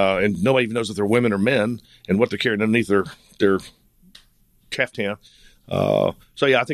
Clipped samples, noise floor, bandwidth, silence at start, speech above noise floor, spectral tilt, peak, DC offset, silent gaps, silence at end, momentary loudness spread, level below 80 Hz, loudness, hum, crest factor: under 0.1%; -57 dBFS; 14 kHz; 0 s; 37 dB; -6 dB/octave; -2 dBFS; under 0.1%; none; 0 s; 9 LU; -54 dBFS; -21 LUFS; none; 18 dB